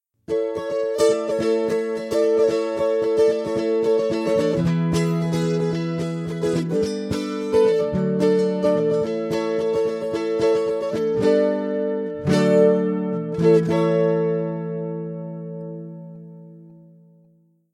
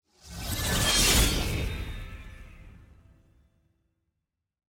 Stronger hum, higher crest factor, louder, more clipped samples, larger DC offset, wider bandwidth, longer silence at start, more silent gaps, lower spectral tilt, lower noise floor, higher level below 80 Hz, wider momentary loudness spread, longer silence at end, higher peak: neither; about the same, 16 dB vs 20 dB; first, -21 LUFS vs -25 LUFS; neither; neither; second, 12.5 kHz vs 17 kHz; about the same, 0.3 s vs 0.25 s; neither; first, -7 dB/octave vs -2.5 dB/octave; second, -58 dBFS vs -84 dBFS; second, -54 dBFS vs -36 dBFS; second, 10 LU vs 24 LU; second, 1 s vs 2.05 s; first, -6 dBFS vs -10 dBFS